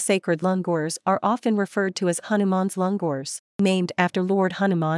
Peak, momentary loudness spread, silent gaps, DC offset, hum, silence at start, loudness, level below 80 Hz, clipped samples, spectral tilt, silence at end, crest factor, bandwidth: -4 dBFS; 4 LU; 3.39-3.59 s; under 0.1%; none; 0 s; -23 LUFS; -74 dBFS; under 0.1%; -5.5 dB/octave; 0 s; 18 dB; 12 kHz